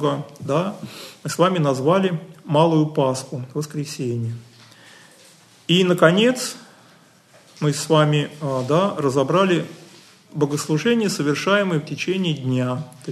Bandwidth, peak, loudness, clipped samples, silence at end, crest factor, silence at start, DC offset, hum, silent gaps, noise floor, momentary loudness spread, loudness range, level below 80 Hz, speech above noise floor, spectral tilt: 13 kHz; 0 dBFS; -20 LUFS; under 0.1%; 0 s; 20 dB; 0 s; under 0.1%; none; none; -52 dBFS; 12 LU; 3 LU; -66 dBFS; 32 dB; -5.5 dB/octave